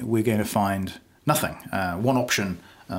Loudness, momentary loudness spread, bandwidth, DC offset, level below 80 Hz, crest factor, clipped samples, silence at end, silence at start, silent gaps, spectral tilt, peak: -25 LUFS; 9 LU; 16.5 kHz; under 0.1%; -54 dBFS; 18 dB; under 0.1%; 0 s; 0 s; none; -5 dB/octave; -6 dBFS